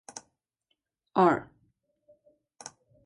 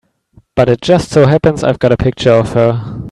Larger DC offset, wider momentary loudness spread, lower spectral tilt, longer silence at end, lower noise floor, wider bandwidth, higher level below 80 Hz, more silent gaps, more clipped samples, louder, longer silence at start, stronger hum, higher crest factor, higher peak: neither; first, 23 LU vs 5 LU; about the same, -6 dB/octave vs -7 dB/octave; first, 0.4 s vs 0 s; first, -80 dBFS vs -48 dBFS; about the same, 11.5 kHz vs 11.5 kHz; second, -72 dBFS vs -36 dBFS; neither; neither; second, -26 LUFS vs -12 LUFS; first, 1.15 s vs 0.55 s; neither; first, 22 dB vs 12 dB; second, -10 dBFS vs 0 dBFS